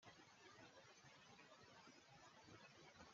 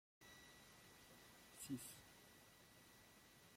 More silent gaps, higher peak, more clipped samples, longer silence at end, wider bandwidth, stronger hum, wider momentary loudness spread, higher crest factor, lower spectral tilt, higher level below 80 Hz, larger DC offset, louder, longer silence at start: neither; second, -46 dBFS vs -38 dBFS; neither; about the same, 0 s vs 0 s; second, 7.4 kHz vs 16.5 kHz; neither; second, 2 LU vs 14 LU; about the same, 20 dB vs 22 dB; about the same, -2.5 dB/octave vs -3.5 dB/octave; second, under -90 dBFS vs -82 dBFS; neither; second, -66 LUFS vs -60 LUFS; second, 0 s vs 0.2 s